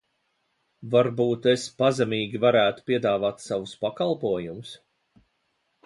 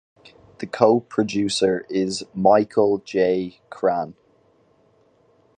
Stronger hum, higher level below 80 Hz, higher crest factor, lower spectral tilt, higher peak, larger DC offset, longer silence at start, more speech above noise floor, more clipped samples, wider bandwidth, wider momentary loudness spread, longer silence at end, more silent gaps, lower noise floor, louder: neither; about the same, -64 dBFS vs -60 dBFS; about the same, 18 dB vs 22 dB; about the same, -5.5 dB/octave vs -5 dB/octave; second, -8 dBFS vs 0 dBFS; neither; first, 0.8 s vs 0.6 s; first, 49 dB vs 39 dB; neither; about the same, 11.5 kHz vs 10.5 kHz; about the same, 10 LU vs 12 LU; second, 1.1 s vs 1.45 s; neither; first, -73 dBFS vs -59 dBFS; second, -24 LUFS vs -21 LUFS